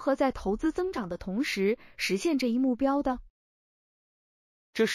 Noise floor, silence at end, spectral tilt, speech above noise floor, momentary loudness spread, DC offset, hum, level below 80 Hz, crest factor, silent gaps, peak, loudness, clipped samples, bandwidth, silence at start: under -90 dBFS; 0 s; -5 dB/octave; over 62 dB; 7 LU; under 0.1%; none; -52 dBFS; 16 dB; 3.30-4.73 s; -14 dBFS; -29 LUFS; under 0.1%; 14.5 kHz; 0 s